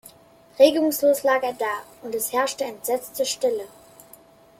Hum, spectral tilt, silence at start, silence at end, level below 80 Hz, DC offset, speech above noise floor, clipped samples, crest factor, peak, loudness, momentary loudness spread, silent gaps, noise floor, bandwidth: none; -2 dB/octave; 0.05 s; 0.95 s; -68 dBFS; under 0.1%; 30 dB; under 0.1%; 20 dB; -4 dBFS; -23 LUFS; 13 LU; none; -52 dBFS; 16.5 kHz